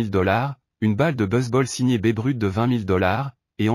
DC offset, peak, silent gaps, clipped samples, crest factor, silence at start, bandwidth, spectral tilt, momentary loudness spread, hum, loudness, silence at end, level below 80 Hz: under 0.1%; -6 dBFS; none; under 0.1%; 14 dB; 0 s; 14.5 kHz; -6.5 dB/octave; 5 LU; none; -22 LUFS; 0 s; -52 dBFS